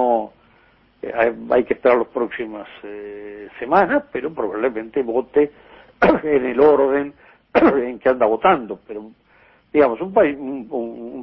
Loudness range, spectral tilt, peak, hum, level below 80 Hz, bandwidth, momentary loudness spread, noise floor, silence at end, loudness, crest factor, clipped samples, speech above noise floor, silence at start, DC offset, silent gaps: 5 LU; -8.5 dB/octave; 0 dBFS; none; -52 dBFS; 5.8 kHz; 18 LU; -55 dBFS; 0 s; -19 LUFS; 18 dB; under 0.1%; 37 dB; 0 s; under 0.1%; none